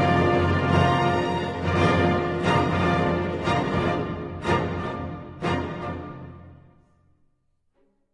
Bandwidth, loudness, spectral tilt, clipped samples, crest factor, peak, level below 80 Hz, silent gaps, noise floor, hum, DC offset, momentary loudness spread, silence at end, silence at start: 11 kHz; -24 LUFS; -7 dB/octave; under 0.1%; 16 dB; -8 dBFS; -48 dBFS; none; -68 dBFS; none; under 0.1%; 13 LU; 1.6 s; 0 s